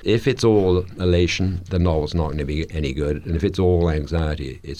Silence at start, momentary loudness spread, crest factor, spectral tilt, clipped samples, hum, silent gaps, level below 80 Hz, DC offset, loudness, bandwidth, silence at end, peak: 0 s; 8 LU; 14 dB; -7 dB/octave; under 0.1%; none; none; -32 dBFS; under 0.1%; -21 LUFS; 10.5 kHz; 0 s; -6 dBFS